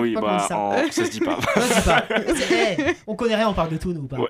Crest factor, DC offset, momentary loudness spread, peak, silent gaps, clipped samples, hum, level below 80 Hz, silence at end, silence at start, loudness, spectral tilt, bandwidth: 18 dB; under 0.1%; 6 LU; -4 dBFS; none; under 0.1%; none; -38 dBFS; 0 s; 0 s; -21 LUFS; -4.5 dB/octave; 15.5 kHz